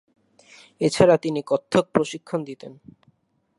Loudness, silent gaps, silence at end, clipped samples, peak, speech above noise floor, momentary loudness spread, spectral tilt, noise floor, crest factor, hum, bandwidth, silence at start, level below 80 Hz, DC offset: -22 LUFS; none; 0.85 s; under 0.1%; -2 dBFS; 42 dB; 19 LU; -5.5 dB/octave; -64 dBFS; 22 dB; none; 11.5 kHz; 0.8 s; -58 dBFS; under 0.1%